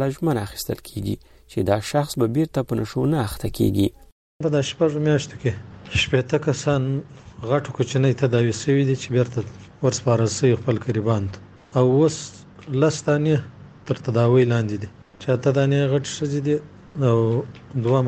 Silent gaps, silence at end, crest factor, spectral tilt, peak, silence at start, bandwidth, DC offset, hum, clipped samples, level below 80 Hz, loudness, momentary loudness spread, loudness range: 4.12-4.39 s; 0 s; 16 dB; -6.5 dB/octave; -6 dBFS; 0 s; 14.5 kHz; under 0.1%; none; under 0.1%; -48 dBFS; -22 LUFS; 11 LU; 2 LU